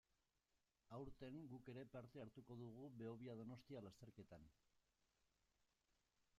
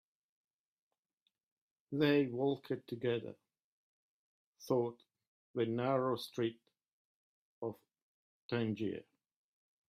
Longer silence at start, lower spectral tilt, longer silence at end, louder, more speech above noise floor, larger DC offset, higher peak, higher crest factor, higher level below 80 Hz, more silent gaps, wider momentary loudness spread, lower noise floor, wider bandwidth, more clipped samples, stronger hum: second, 0.85 s vs 1.9 s; about the same, -7.5 dB/octave vs -7 dB/octave; first, 1.6 s vs 0.9 s; second, -59 LUFS vs -37 LUFS; second, 31 dB vs 50 dB; neither; second, -42 dBFS vs -18 dBFS; about the same, 18 dB vs 22 dB; about the same, -80 dBFS vs -82 dBFS; second, none vs 3.64-4.53 s, 5.27-5.54 s, 6.86-7.62 s, 8.02-8.49 s; second, 8 LU vs 13 LU; about the same, -89 dBFS vs -86 dBFS; second, 11 kHz vs 15 kHz; neither; neither